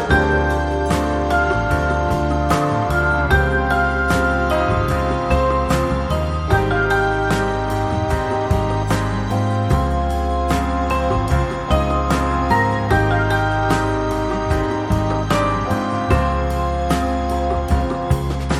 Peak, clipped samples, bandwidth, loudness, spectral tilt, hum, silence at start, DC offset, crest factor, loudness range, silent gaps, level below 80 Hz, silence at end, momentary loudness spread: -2 dBFS; under 0.1%; 14.5 kHz; -19 LUFS; -6.5 dB/octave; none; 0 s; under 0.1%; 16 dB; 2 LU; none; -24 dBFS; 0 s; 4 LU